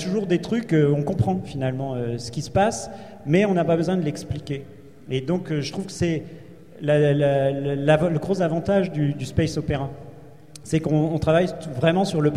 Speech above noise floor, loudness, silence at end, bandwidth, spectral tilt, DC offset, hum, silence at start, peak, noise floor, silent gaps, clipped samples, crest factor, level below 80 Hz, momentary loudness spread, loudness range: 23 dB; -23 LUFS; 0 s; 12 kHz; -7 dB/octave; 0.4%; none; 0 s; -6 dBFS; -45 dBFS; none; under 0.1%; 18 dB; -46 dBFS; 11 LU; 3 LU